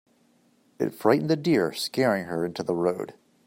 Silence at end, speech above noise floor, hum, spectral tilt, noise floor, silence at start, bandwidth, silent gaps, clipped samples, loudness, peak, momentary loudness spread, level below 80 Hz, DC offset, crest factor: 0.35 s; 39 dB; none; -6 dB/octave; -63 dBFS; 0.8 s; 16 kHz; none; under 0.1%; -26 LUFS; -6 dBFS; 9 LU; -68 dBFS; under 0.1%; 20 dB